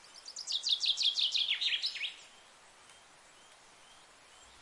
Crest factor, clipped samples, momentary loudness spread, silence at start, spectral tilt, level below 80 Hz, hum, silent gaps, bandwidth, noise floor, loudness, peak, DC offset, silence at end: 18 dB; under 0.1%; 15 LU; 0.05 s; 3.5 dB/octave; -78 dBFS; none; none; 11.5 kHz; -59 dBFS; -31 LUFS; -18 dBFS; under 0.1%; 0 s